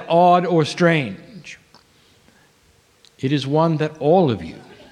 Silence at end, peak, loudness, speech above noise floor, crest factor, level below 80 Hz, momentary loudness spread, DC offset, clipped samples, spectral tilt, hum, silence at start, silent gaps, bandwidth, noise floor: 0.3 s; -4 dBFS; -18 LUFS; 39 dB; 16 dB; -58 dBFS; 22 LU; under 0.1%; under 0.1%; -7 dB/octave; none; 0 s; none; 10.5 kHz; -56 dBFS